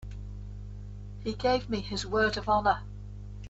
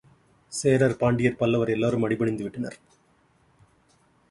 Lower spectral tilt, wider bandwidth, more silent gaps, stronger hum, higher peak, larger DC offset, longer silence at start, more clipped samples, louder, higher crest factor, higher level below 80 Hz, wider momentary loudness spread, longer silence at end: second, -5 dB/octave vs -6.5 dB/octave; second, 8.2 kHz vs 11.5 kHz; neither; first, 50 Hz at -40 dBFS vs none; second, -12 dBFS vs -8 dBFS; neither; second, 0 s vs 0.5 s; neither; second, -29 LUFS vs -25 LUFS; about the same, 20 dB vs 20 dB; first, -44 dBFS vs -56 dBFS; first, 18 LU vs 13 LU; second, 0 s vs 1.55 s